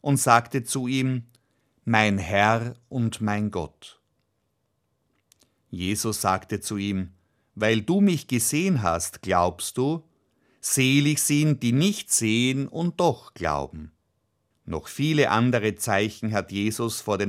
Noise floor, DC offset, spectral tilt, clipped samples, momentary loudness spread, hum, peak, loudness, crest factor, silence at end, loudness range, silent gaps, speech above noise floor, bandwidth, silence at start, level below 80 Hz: -74 dBFS; under 0.1%; -4.5 dB/octave; under 0.1%; 12 LU; none; -2 dBFS; -24 LUFS; 24 dB; 0 s; 8 LU; none; 50 dB; 16 kHz; 0.05 s; -54 dBFS